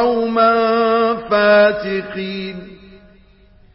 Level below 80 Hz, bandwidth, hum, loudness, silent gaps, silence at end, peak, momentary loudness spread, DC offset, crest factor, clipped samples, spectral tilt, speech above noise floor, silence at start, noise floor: -50 dBFS; 5.8 kHz; none; -15 LUFS; none; 0.8 s; -2 dBFS; 14 LU; under 0.1%; 14 dB; under 0.1%; -9.5 dB/octave; 33 dB; 0 s; -48 dBFS